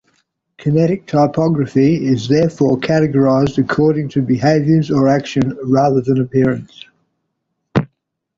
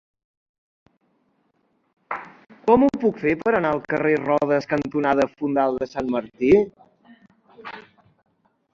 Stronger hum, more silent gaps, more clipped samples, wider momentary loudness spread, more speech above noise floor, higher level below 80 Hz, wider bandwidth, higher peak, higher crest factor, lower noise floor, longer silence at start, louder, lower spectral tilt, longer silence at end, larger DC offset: neither; neither; neither; second, 6 LU vs 16 LU; first, 58 dB vs 47 dB; first, -48 dBFS vs -56 dBFS; about the same, 7.6 kHz vs 7.6 kHz; about the same, -2 dBFS vs -2 dBFS; second, 12 dB vs 20 dB; first, -72 dBFS vs -67 dBFS; second, 0.6 s vs 2.1 s; first, -15 LUFS vs -21 LUFS; about the same, -8 dB/octave vs -7.5 dB/octave; second, 0.55 s vs 0.95 s; neither